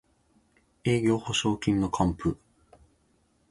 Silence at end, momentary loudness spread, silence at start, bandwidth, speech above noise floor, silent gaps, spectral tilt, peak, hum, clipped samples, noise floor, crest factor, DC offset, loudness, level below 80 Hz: 1.15 s; 7 LU; 0.85 s; 11.5 kHz; 42 dB; none; -5.5 dB/octave; -10 dBFS; none; under 0.1%; -68 dBFS; 20 dB; under 0.1%; -27 LUFS; -48 dBFS